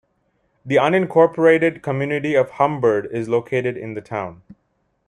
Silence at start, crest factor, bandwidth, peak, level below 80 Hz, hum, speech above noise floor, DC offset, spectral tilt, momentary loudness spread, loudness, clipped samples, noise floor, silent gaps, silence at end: 0.65 s; 16 dB; 10 kHz; -2 dBFS; -60 dBFS; none; 49 dB; under 0.1%; -7 dB/octave; 13 LU; -19 LUFS; under 0.1%; -68 dBFS; none; 0.75 s